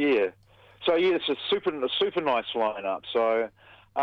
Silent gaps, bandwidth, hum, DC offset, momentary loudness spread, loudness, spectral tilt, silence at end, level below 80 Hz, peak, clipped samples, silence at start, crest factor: none; 6 kHz; none; under 0.1%; 7 LU; -27 LUFS; -6 dB/octave; 0 s; -68 dBFS; -12 dBFS; under 0.1%; 0 s; 14 dB